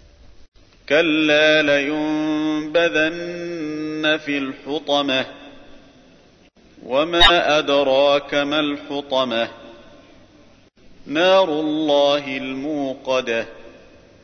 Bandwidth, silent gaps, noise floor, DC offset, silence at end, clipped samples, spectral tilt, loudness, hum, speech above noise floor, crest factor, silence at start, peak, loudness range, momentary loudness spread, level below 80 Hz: 11 kHz; 0.48-0.52 s; -51 dBFS; under 0.1%; 0.55 s; under 0.1%; -4 dB/octave; -19 LUFS; none; 33 dB; 20 dB; 0.3 s; 0 dBFS; 6 LU; 12 LU; -44 dBFS